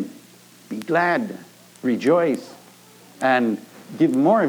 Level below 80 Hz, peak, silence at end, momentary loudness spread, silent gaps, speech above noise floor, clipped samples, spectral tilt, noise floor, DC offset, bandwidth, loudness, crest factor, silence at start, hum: -84 dBFS; -6 dBFS; 0 s; 16 LU; none; 29 dB; under 0.1%; -6.5 dB/octave; -49 dBFS; under 0.1%; over 20 kHz; -21 LUFS; 16 dB; 0 s; none